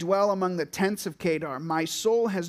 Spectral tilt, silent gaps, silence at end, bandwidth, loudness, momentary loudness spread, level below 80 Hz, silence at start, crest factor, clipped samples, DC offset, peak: -5 dB/octave; none; 0 s; 15.5 kHz; -27 LUFS; 5 LU; -64 dBFS; 0 s; 16 dB; under 0.1%; under 0.1%; -12 dBFS